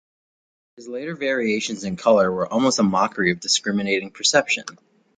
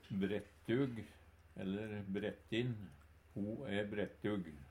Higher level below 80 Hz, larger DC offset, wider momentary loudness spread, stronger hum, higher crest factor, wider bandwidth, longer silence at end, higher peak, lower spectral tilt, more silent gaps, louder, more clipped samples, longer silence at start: first, -58 dBFS vs -66 dBFS; neither; second, 9 LU vs 13 LU; neither; about the same, 20 dB vs 18 dB; second, 9.6 kHz vs 15.5 kHz; first, 0.45 s vs 0 s; first, -2 dBFS vs -24 dBFS; second, -3.5 dB/octave vs -7.5 dB/octave; neither; first, -20 LUFS vs -42 LUFS; neither; first, 0.8 s vs 0.05 s